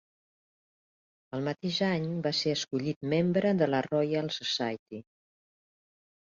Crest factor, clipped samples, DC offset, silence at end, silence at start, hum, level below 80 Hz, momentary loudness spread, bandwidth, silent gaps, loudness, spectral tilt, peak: 18 dB; under 0.1%; under 0.1%; 1.3 s; 1.35 s; none; -70 dBFS; 9 LU; 7.6 kHz; 2.96-3.01 s, 4.79-4.86 s; -30 LUFS; -5.5 dB/octave; -14 dBFS